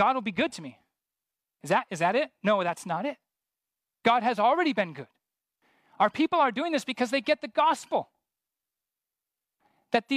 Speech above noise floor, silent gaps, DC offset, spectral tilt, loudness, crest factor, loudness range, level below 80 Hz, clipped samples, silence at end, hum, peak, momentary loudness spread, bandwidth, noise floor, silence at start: 63 dB; none; under 0.1%; -4.5 dB/octave; -27 LUFS; 20 dB; 3 LU; -76 dBFS; under 0.1%; 0 s; none; -8 dBFS; 9 LU; 15 kHz; -89 dBFS; 0 s